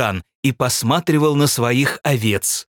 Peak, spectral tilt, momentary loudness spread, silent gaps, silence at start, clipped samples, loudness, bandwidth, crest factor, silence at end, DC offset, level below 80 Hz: -2 dBFS; -4.5 dB/octave; 6 LU; 0.35-0.43 s; 0 s; under 0.1%; -17 LUFS; 18.5 kHz; 16 dB; 0.15 s; under 0.1%; -56 dBFS